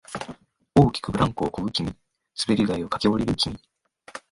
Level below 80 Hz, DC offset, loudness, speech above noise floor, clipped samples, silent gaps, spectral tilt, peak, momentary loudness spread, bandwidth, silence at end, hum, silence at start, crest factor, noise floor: -46 dBFS; under 0.1%; -24 LUFS; 21 dB; under 0.1%; none; -6 dB/octave; -6 dBFS; 19 LU; 11.5 kHz; 0.15 s; none; 0.1 s; 20 dB; -45 dBFS